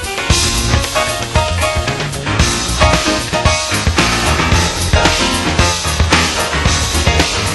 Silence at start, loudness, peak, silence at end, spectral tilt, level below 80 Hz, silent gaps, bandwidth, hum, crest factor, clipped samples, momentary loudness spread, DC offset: 0 s; -13 LUFS; 0 dBFS; 0 s; -3.5 dB/octave; -22 dBFS; none; 12.5 kHz; none; 14 dB; under 0.1%; 4 LU; under 0.1%